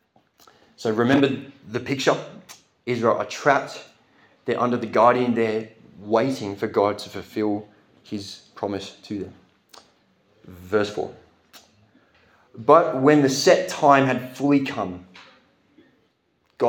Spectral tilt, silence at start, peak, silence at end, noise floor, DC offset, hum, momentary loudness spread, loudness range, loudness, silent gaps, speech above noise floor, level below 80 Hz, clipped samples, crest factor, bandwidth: -5 dB/octave; 0.8 s; -2 dBFS; 0 s; -67 dBFS; under 0.1%; none; 17 LU; 13 LU; -22 LUFS; none; 46 dB; -70 dBFS; under 0.1%; 22 dB; 18 kHz